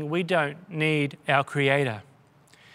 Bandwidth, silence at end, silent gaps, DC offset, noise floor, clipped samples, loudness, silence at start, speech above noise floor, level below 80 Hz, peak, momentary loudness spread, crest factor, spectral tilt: 13 kHz; 0.7 s; none; under 0.1%; -57 dBFS; under 0.1%; -25 LUFS; 0 s; 32 dB; -72 dBFS; -6 dBFS; 8 LU; 22 dB; -6 dB/octave